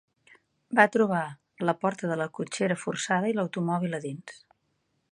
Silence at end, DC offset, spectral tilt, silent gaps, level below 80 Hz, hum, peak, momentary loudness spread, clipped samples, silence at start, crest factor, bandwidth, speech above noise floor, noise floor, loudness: 0.8 s; under 0.1%; -5.5 dB/octave; none; -76 dBFS; none; -4 dBFS; 14 LU; under 0.1%; 0.7 s; 26 dB; 10.5 kHz; 48 dB; -75 dBFS; -27 LUFS